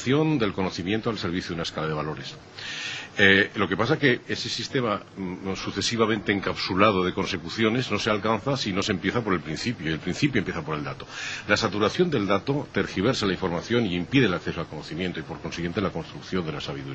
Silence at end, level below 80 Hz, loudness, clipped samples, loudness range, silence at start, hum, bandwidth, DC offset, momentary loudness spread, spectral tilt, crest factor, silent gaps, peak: 0 s; -52 dBFS; -25 LUFS; under 0.1%; 3 LU; 0 s; none; 8.6 kHz; under 0.1%; 11 LU; -5 dB/octave; 22 dB; none; -2 dBFS